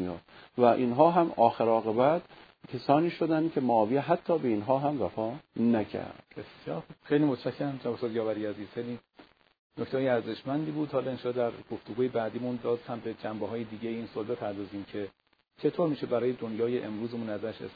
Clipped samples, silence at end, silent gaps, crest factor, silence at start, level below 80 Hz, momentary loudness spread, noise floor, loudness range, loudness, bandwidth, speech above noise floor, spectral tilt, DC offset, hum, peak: under 0.1%; 0 s; 9.59-9.70 s; 22 dB; 0 s; -70 dBFS; 14 LU; -59 dBFS; 8 LU; -30 LUFS; 5 kHz; 29 dB; -10 dB/octave; under 0.1%; none; -8 dBFS